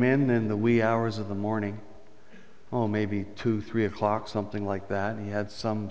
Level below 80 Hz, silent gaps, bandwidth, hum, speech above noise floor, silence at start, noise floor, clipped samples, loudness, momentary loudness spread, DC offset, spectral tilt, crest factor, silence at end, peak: -56 dBFS; none; 8 kHz; none; 27 dB; 0 s; -54 dBFS; under 0.1%; -28 LUFS; 9 LU; 0.7%; -8 dB/octave; 18 dB; 0 s; -10 dBFS